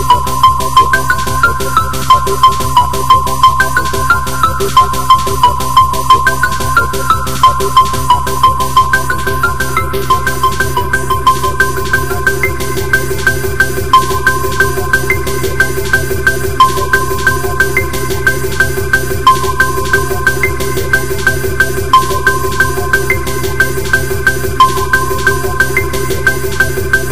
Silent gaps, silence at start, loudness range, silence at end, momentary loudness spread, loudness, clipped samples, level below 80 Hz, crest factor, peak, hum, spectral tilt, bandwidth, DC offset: none; 0 s; 2 LU; 0 s; 5 LU; -11 LUFS; 0.6%; -24 dBFS; 12 dB; 0 dBFS; none; -3.5 dB/octave; 16.5 kHz; 10%